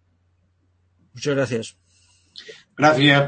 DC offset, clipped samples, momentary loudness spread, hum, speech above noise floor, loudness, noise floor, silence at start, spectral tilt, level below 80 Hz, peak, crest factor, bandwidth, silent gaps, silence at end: under 0.1%; under 0.1%; 26 LU; none; 45 dB; -20 LUFS; -64 dBFS; 1.15 s; -5 dB/octave; -62 dBFS; -2 dBFS; 20 dB; 8.8 kHz; none; 0 s